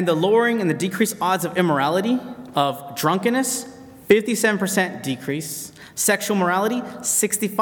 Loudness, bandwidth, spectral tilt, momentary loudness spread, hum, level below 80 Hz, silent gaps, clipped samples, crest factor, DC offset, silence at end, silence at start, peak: -21 LUFS; 19 kHz; -4 dB/octave; 9 LU; none; -66 dBFS; none; under 0.1%; 18 dB; under 0.1%; 0 s; 0 s; -2 dBFS